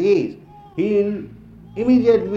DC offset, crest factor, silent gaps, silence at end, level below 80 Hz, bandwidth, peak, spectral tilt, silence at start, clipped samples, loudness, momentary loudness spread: under 0.1%; 14 dB; none; 0 s; -50 dBFS; 7.2 kHz; -4 dBFS; -8 dB/octave; 0 s; under 0.1%; -19 LUFS; 19 LU